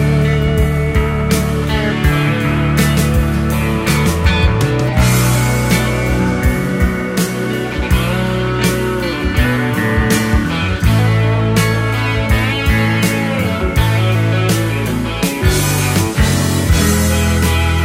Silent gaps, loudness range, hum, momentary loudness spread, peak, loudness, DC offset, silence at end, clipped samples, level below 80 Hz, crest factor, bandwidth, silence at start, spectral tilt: none; 2 LU; none; 4 LU; 0 dBFS; -14 LUFS; under 0.1%; 0 s; under 0.1%; -22 dBFS; 14 dB; 16 kHz; 0 s; -5.5 dB/octave